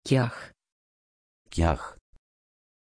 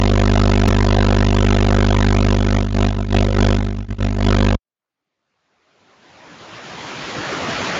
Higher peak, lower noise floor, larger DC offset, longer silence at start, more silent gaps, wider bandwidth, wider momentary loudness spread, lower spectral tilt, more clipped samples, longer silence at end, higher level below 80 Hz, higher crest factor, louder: second, -8 dBFS vs -2 dBFS; first, under -90 dBFS vs -86 dBFS; neither; about the same, 0.05 s vs 0 s; first, 0.72-1.45 s vs none; first, 10.5 kHz vs 7.8 kHz; first, 18 LU vs 12 LU; about the same, -6.5 dB/octave vs -6.5 dB/octave; neither; first, 0.95 s vs 0 s; second, -40 dBFS vs -22 dBFS; first, 22 dB vs 14 dB; second, -28 LUFS vs -17 LUFS